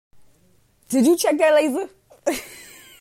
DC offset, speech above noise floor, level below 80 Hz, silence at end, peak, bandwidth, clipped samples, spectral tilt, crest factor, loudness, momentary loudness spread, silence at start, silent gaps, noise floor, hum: under 0.1%; 41 dB; -62 dBFS; 0.4 s; -6 dBFS; 16 kHz; under 0.1%; -3.5 dB/octave; 16 dB; -20 LUFS; 19 LU; 0.9 s; none; -59 dBFS; none